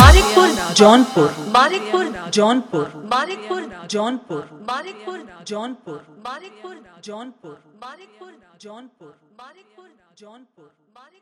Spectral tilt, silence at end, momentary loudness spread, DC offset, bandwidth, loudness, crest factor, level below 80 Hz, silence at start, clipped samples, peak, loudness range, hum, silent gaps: -5 dB/octave; 2.4 s; 27 LU; under 0.1%; 17 kHz; -17 LUFS; 18 dB; -26 dBFS; 0 s; under 0.1%; 0 dBFS; 24 LU; none; none